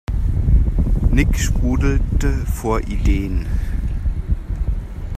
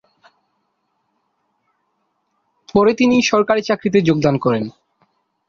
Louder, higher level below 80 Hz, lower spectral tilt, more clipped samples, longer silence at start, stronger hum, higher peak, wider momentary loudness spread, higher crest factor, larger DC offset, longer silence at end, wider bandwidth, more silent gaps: second, -20 LUFS vs -16 LUFS; first, -18 dBFS vs -54 dBFS; about the same, -6.5 dB/octave vs -5.5 dB/octave; neither; second, 0.1 s vs 2.75 s; neither; about the same, -2 dBFS vs 0 dBFS; about the same, 7 LU vs 6 LU; about the same, 16 dB vs 18 dB; neither; second, 0 s vs 0.8 s; first, 14.5 kHz vs 7.4 kHz; neither